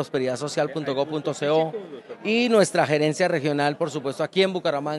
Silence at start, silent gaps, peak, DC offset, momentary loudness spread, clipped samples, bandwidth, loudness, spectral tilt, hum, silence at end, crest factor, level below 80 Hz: 0 s; none; -4 dBFS; under 0.1%; 8 LU; under 0.1%; 12.5 kHz; -23 LUFS; -5 dB/octave; none; 0 s; 18 dB; -76 dBFS